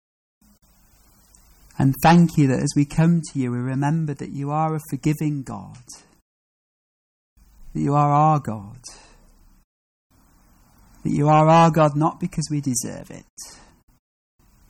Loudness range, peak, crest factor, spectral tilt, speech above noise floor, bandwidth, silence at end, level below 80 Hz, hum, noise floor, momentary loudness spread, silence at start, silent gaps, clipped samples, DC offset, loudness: 7 LU; -8 dBFS; 16 dB; -6.5 dB/octave; 36 dB; 17.5 kHz; 1.2 s; -50 dBFS; none; -56 dBFS; 24 LU; 1.8 s; 6.22-7.36 s, 9.64-10.10 s, 13.30-13.37 s; under 0.1%; under 0.1%; -20 LUFS